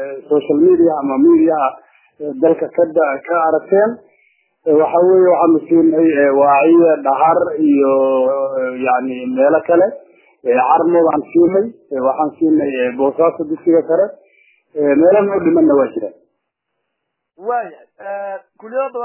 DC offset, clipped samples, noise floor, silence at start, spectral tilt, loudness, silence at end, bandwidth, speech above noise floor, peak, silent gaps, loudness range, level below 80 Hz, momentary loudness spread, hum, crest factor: under 0.1%; under 0.1%; -75 dBFS; 0 s; -11 dB/octave; -14 LUFS; 0 s; 3.2 kHz; 61 dB; -2 dBFS; none; 5 LU; -60 dBFS; 14 LU; none; 12 dB